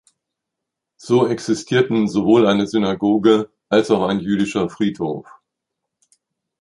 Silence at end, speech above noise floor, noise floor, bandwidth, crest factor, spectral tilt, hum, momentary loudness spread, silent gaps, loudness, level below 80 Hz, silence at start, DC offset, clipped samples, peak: 1.4 s; 65 dB; -82 dBFS; 11 kHz; 18 dB; -6 dB/octave; none; 7 LU; none; -18 LUFS; -56 dBFS; 1.05 s; under 0.1%; under 0.1%; -2 dBFS